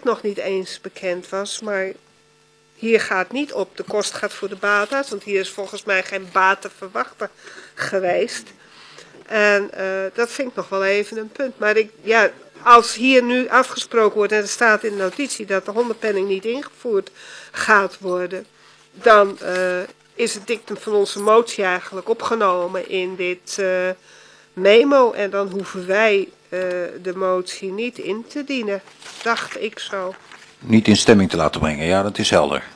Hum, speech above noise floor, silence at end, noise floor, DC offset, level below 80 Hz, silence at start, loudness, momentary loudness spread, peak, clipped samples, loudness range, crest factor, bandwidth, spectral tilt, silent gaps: none; 36 dB; 0 s; -56 dBFS; under 0.1%; -54 dBFS; 0.05 s; -19 LUFS; 13 LU; 0 dBFS; under 0.1%; 7 LU; 20 dB; 11 kHz; -4 dB/octave; none